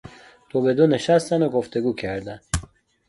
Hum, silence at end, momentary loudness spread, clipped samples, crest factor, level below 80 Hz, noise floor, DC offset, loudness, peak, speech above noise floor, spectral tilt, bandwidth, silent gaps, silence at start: none; 0.45 s; 11 LU; under 0.1%; 18 dB; -42 dBFS; -45 dBFS; under 0.1%; -22 LUFS; -4 dBFS; 24 dB; -6 dB/octave; 11.5 kHz; none; 0.05 s